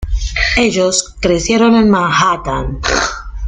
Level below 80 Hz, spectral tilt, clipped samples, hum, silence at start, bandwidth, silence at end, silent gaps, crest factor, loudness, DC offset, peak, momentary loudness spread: -24 dBFS; -4 dB/octave; under 0.1%; none; 0 s; 9.6 kHz; 0 s; none; 14 dB; -13 LUFS; under 0.1%; 0 dBFS; 8 LU